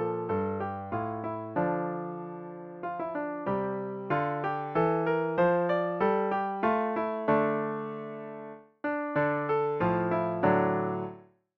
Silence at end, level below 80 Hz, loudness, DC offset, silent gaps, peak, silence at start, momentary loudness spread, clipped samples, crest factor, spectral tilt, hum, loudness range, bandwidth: 0.35 s; -64 dBFS; -30 LUFS; under 0.1%; none; -10 dBFS; 0 s; 13 LU; under 0.1%; 18 dB; -10 dB/octave; none; 6 LU; 5.6 kHz